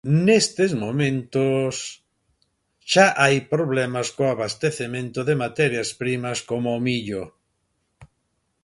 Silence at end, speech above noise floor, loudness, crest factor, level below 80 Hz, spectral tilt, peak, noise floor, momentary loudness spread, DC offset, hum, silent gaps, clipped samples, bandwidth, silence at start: 0.6 s; 51 dB; -22 LUFS; 22 dB; -60 dBFS; -5 dB/octave; -2 dBFS; -72 dBFS; 11 LU; under 0.1%; none; none; under 0.1%; 11.5 kHz; 0.05 s